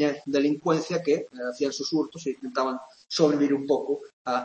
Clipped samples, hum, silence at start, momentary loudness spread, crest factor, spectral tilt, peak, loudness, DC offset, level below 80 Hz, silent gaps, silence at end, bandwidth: under 0.1%; none; 0 s; 9 LU; 18 dB; -5 dB/octave; -8 dBFS; -26 LUFS; under 0.1%; -74 dBFS; 4.13-4.25 s; 0 s; 8.6 kHz